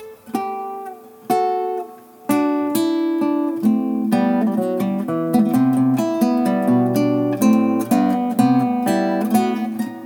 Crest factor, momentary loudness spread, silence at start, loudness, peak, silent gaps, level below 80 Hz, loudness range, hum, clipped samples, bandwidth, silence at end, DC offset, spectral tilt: 16 dB; 10 LU; 0 s; -19 LUFS; -2 dBFS; none; -66 dBFS; 4 LU; none; under 0.1%; 19.5 kHz; 0 s; under 0.1%; -6.5 dB/octave